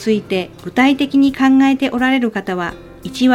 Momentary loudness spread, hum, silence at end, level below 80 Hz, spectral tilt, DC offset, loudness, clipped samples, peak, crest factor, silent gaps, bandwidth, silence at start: 11 LU; none; 0 s; -48 dBFS; -5.5 dB/octave; under 0.1%; -15 LUFS; under 0.1%; 0 dBFS; 14 dB; none; 12.5 kHz; 0 s